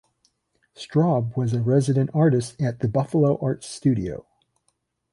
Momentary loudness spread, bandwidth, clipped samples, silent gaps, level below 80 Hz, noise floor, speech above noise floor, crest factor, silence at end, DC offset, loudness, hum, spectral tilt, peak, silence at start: 8 LU; 11.5 kHz; under 0.1%; none; -54 dBFS; -72 dBFS; 51 dB; 16 dB; 0.9 s; under 0.1%; -23 LUFS; none; -8 dB/octave; -8 dBFS; 0.8 s